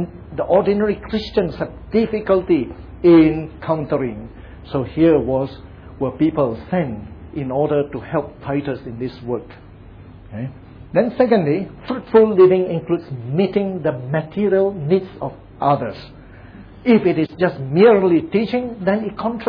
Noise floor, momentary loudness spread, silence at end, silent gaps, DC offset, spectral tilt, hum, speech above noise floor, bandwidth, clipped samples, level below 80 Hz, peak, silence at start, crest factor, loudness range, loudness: -40 dBFS; 16 LU; 0 s; none; under 0.1%; -10 dB/octave; none; 22 dB; 5.4 kHz; under 0.1%; -44 dBFS; -2 dBFS; 0 s; 16 dB; 6 LU; -18 LUFS